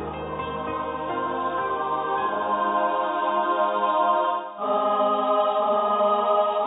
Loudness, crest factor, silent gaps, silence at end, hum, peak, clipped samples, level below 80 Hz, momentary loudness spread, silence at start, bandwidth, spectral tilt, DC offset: -24 LUFS; 14 dB; none; 0 s; none; -10 dBFS; under 0.1%; -54 dBFS; 8 LU; 0 s; 4 kHz; -9 dB/octave; under 0.1%